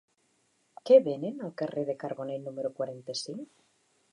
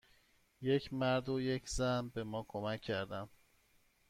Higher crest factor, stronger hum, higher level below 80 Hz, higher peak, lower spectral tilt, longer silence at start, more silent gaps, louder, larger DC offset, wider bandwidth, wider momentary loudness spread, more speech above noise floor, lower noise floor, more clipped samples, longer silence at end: first, 22 dB vs 16 dB; neither; second, -86 dBFS vs -58 dBFS; first, -8 dBFS vs -22 dBFS; about the same, -5.5 dB/octave vs -5.5 dB/octave; first, 0.85 s vs 0.6 s; neither; first, -30 LUFS vs -38 LUFS; neither; second, 10.5 kHz vs 15.5 kHz; first, 19 LU vs 8 LU; first, 43 dB vs 35 dB; about the same, -72 dBFS vs -72 dBFS; neither; second, 0.65 s vs 0.85 s